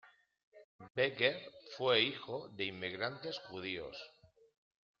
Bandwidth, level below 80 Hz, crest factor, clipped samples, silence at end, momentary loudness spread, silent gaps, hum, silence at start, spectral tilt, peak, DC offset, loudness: 7 kHz; -78 dBFS; 22 dB; under 0.1%; 0.9 s; 17 LU; 0.43-0.52 s, 0.64-0.79 s, 0.90-0.95 s; none; 0.05 s; -1.5 dB/octave; -18 dBFS; under 0.1%; -37 LUFS